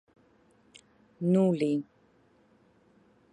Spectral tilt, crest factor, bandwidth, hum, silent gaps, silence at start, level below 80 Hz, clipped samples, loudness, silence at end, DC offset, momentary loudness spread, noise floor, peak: -8.5 dB/octave; 18 dB; 10 kHz; none; none; 1.2 s; -76 dBFS; under 0.1%; -28 LUFS; 1.5 s; under 0.1%; 11 LU; -64 dBFS; -14 dBFS